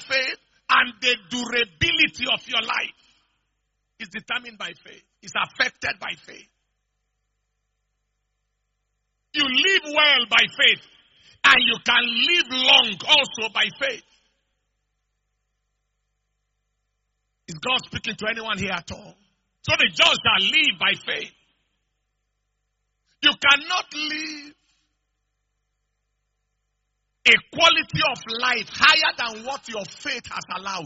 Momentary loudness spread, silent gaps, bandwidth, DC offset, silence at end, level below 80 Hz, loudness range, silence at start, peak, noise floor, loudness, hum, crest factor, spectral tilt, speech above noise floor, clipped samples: 16 LU; none; 8 kHz; under 0.1%; 0 s; -58 dBFS; 13 LU; 0 s; 0 dBFS; -76 dBFS; -19 LUFS; 50 Hz at -70 dBFS; 24 dB; 1 dB/octave; 54 dB; under 0.1%